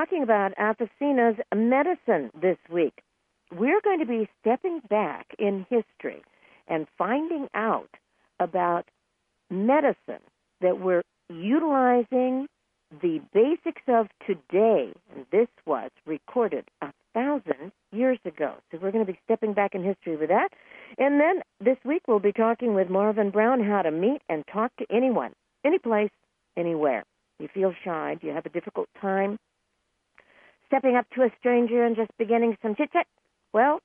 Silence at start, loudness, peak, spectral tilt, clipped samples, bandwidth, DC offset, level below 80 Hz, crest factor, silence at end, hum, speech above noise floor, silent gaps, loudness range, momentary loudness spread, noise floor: 0 s; -26 LUFS; -8 dBFS; -9.5 dB/octave; under 0.1%; 3.6 kHz; under 0.1%; -76 dBFS; 18 dB; 0.05 s; none; 51 dB; none; 5 LU; 10 LU; -76 dBFS